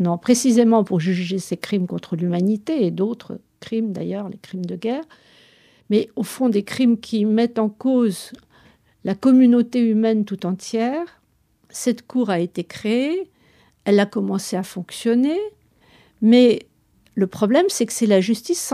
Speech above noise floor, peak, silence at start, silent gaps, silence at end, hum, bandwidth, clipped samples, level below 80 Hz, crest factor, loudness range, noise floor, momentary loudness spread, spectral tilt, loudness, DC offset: 43 dB; -4 dBFS; 0 s; none; 0 s; none; 14.5 kHz; under 0.1%; -66 dBFS; 16 dB; 6 LU; -62 dBFS; 14 LU; -5.5 dB/octave; -20 LUFS; under 0.1%